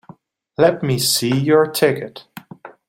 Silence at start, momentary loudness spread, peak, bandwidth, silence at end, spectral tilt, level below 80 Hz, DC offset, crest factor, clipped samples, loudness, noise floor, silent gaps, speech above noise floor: 0.6 s; 18 LU; -2 dBFS; 16.5 kHz; 0.2 s; -4.5 dB/octave; -58 dBFS; under 0.1%; 18 dB; under 0.1%; -17 LUFS; -46 dBFS; none; 29 dB